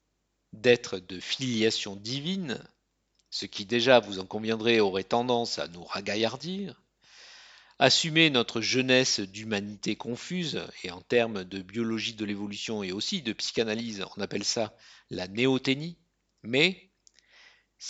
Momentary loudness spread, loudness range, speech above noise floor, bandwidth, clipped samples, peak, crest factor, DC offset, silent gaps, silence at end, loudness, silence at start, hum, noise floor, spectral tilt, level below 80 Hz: 14 LU; 6 LU; 49 dB; 9 kHz; under 0.1%; -4 dBFS; 26 dB; under 0.1%; none; 0 s; -28 LUFS; 0.55 s; none; -77 dBFS; -3.5 dB/octave; -68 dBFS